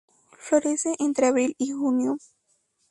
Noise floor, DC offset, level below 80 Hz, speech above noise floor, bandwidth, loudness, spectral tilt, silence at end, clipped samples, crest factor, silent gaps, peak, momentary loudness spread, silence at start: -70 dBFS; under 0.1%; -72 dBFS; 47 dB; 11.5 kHz; -24 LUFS; -3.5 dB/octave; 0.7 s; under 0.1%; 16 dB; none; -8 dBFS; 7 LU; 0.4 s